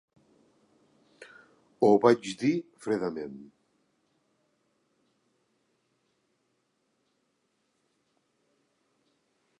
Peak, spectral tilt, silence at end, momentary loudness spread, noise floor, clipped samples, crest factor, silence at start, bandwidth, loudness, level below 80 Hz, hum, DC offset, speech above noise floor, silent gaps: -6 dBFS; -6 dB/octave; 6.15 s; 19 LU; -76 dBFS; under 0.1%; 26 dB; 1.2 s; 11.5 kHz; -26 LUFS; -78 dBFS; none; under 0.1%; 50 dB; none